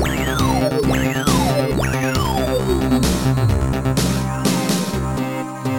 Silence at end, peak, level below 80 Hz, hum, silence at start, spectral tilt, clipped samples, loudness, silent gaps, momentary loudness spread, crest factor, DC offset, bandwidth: 0 s; -4 dBFS; -28 dBFS; none; 0 s; -5.5 dB/octave; under 0.1%; -19 LUFS; none; 4 LU; 14 dB; under 0.1%; 17 kHz